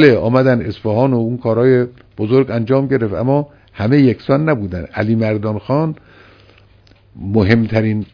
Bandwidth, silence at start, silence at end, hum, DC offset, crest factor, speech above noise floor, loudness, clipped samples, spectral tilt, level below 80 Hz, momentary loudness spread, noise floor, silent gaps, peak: 5.4 kHz; 0 s; 0.1 s; none; under 0.1%; 16 dB; 34 dB; -15 LUFS; under 0.1%; -9.5 dB/octave; -46 dBFS; 9 LU; -48 dBFS; none; 0 dBFS